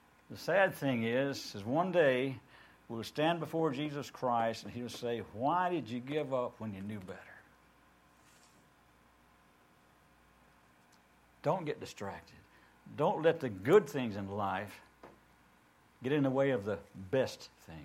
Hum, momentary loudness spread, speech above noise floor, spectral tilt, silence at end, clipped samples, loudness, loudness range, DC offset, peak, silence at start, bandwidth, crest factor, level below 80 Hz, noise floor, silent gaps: none; 17 LU; 32 dB; -6 dB/octave; 0 s; under 0.1%; -34 LUFS; 10 LU; under 0.1%; -12 dBFS; 0.3 s; 16.5 kHz; 24 dB; -72 dBFS; -66 dBFS; none